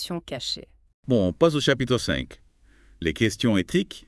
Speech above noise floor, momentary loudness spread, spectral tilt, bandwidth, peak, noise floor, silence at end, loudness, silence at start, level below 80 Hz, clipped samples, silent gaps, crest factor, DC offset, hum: 31 dB; 11 LU; -5 dB/octave; 12 kHz; -6 dBFS; -55 dBFS; 0.1 s; -24 LUFS; 0 s; -48 dBFS; under 0.1%; 0.94-1.03 s; 20 dB; under 0.1%; none